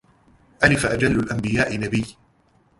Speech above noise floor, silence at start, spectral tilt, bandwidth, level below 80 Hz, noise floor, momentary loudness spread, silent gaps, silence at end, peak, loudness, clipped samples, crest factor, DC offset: 39 dB; 0.6 s; -5.5 dB/octave; 11.5 kHz; -42 dBFS; -60 dBFS; 8 LU; none; 0.7 s; -2 dBFS; -21 LUFS; under 0.1%; 22 dB; under 0.1%